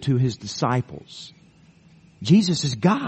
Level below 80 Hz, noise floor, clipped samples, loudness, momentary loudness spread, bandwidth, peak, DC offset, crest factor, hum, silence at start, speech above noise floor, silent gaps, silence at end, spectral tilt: -56 dBFS; -53 dBFS; under 0.1%; -22 LUFS; 22 LU; 8.8 kHz; -4 dBFS; under 0.1%; 18 dB; none; 0 s; 32 dB; none; 0 s; -6 dB/octave